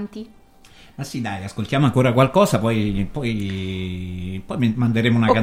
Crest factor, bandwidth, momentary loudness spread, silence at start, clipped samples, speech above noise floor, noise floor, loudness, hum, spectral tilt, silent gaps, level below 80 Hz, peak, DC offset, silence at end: 18 dB; 16 kHz; 14 LU; 0 s; under 0.1%; 28 dB; -47 dBFS; -21 LUFS; none; -6.5 dB/octave; none; -42 dBFS; -2 dBFS; under 0.1%; 0 s